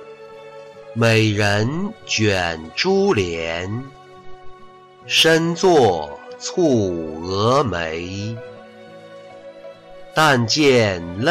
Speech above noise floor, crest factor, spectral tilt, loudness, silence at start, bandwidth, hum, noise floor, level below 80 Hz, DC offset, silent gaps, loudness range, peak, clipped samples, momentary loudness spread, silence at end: 26 dB; 14 dB; -4.5 dB/octave; -18 LUFS; 0 s; 16 kHz; none; -44 dBFS; -50 dBFS; under 0.1%; none; 5 LU; -6 dBFS; under 0.1%; 24 LU; 0 s